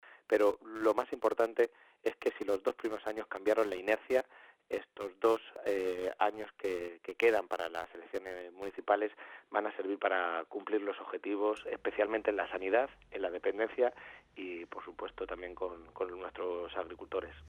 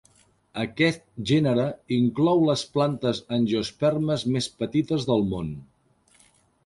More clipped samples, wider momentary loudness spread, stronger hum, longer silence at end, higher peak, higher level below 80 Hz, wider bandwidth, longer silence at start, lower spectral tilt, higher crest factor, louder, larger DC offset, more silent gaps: neither; about the same, 12 LU vs 11 LU; neither; second, 0 s vs 1.05 s; second, -14 dBFS vs -8 dBFS; second, -68 dBFS vs -54 dBFS; first, 17.5 kHz vs 11.5 kHz; second, 0.05 s vs 0.55 s; second, -4.5 dB/octave vs -6.5 dB/octave; about the same, 20 dB vs 18 dB; second, -35 LUFS vs -24 LUFS; neither; neither